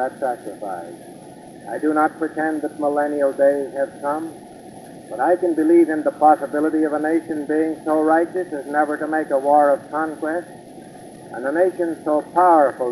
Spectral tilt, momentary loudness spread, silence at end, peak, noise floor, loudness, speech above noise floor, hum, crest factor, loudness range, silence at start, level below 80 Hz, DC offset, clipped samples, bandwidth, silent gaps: -6.5 dB/octave; 24 LU; 0 s; -2 dBFS; -40 dBFS; -19 LUFS; 21 dB; none; 18 dB; 3 LU; 0 s; -66 dBFS; under 0.1%; under 0.1%; 12.5 kHz; none